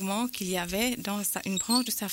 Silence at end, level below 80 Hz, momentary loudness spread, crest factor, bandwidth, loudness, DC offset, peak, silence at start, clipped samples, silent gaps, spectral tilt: 0 s; -56 dBFS; 4 LU; 16 dB; 16.5 kHz; -28 LUFS; under 0.1%; -14 dBFS; 0 s; under 0.1%; none; -3 dB/octave